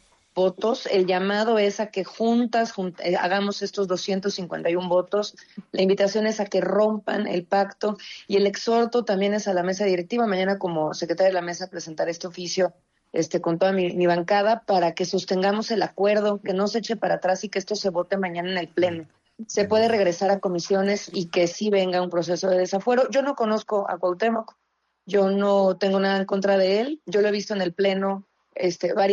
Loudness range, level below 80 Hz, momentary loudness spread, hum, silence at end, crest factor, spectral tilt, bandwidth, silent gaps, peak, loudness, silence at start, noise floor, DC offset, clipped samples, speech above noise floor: 2 LU; -70 dBFS; 7 LU; none; 0 s; 14 dB; -5 dB/octave; 7.6 kHz; none; -10 dBFS; -23 LUFS; 0.35 s; -61 dBFS; under 0.1%; under 0.1%; 38 dB